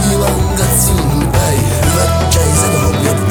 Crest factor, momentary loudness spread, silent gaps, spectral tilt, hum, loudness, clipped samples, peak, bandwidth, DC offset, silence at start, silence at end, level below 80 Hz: 12 dB; 3 LU; none; -4.5 dB/octave; none; -12 LUFS; under 0.1%; 0 dBFS; over 20 kHz; under 0.1%; 0 s; 0 s; -20 dBFS